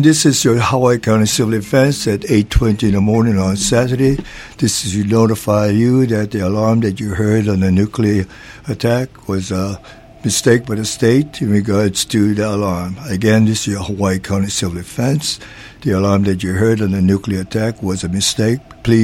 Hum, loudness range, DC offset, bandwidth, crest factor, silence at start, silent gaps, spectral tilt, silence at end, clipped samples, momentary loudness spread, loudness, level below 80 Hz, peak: none; 3 LU; under 0.1%; 16.5 kHz; 14 dB; 0 s; none; -5.5 dB/octave; 0 s; under 0.1%; 8 LU; -15 LUFS; -34 dBFS; 0 dBFS